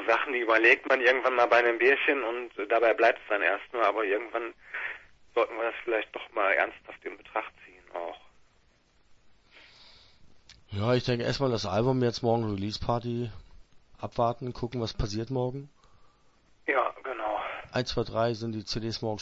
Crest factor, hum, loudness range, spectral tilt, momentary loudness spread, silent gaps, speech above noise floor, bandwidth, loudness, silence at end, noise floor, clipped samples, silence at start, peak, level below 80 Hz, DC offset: 24 dB; none; 11 LU; -5.5 dB/octave; 15 LU; none; 37 dB; 8 kHz; -28 LUFS; 0 s; -65 dBFS; under 0.1%; 0 s; -6 dBFS; -52 dBFS; under 0.1%